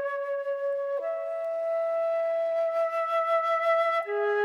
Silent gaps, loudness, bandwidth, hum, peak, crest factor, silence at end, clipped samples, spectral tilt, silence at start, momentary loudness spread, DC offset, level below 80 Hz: none; -28 LUFS; 11.5 kHz; none; -14 dBFS; 12 dB; 0 s; under 0.1%; -2 dB/octave; 0 s; 6 LU; under 0.1%; -86 dBFS